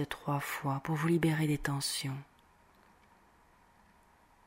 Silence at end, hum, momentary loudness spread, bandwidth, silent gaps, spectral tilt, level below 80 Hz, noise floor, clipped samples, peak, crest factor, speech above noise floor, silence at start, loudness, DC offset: 2.25 s; none; 7 LU; 16 kHz; none; -5 dB/octave; -60 dBFS; -65 dBFS; under 0.1%; -16 dBFS; 20 dB; 32 dB; 0 s; -33 LUFS; under 0.1%